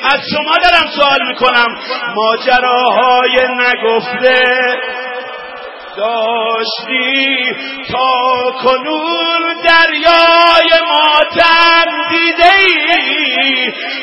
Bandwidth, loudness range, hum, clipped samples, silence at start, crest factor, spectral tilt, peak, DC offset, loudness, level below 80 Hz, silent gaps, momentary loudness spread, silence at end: 11 kHz; 6 LU; none; 0.2%; 0 s; 12 dB; -3.5 dB/octave; 0 dBFS; under 0.1%; -10 LUFS; -44 dBFS; none; 11 LU; 0 s